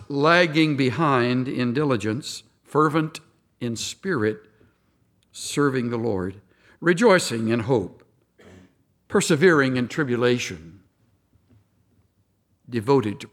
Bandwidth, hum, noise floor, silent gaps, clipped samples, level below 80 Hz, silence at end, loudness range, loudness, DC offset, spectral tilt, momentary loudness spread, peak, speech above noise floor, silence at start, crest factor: 16 kHz; none; -67 dBFS; none; under 0.1%; -64 dBFS; 0.05 s; 6 LU; -22 LUFS; under 0.1%; -5 dB/octave; 15 LU; -4 dBFS; 45 dB; 0 s; 20 dB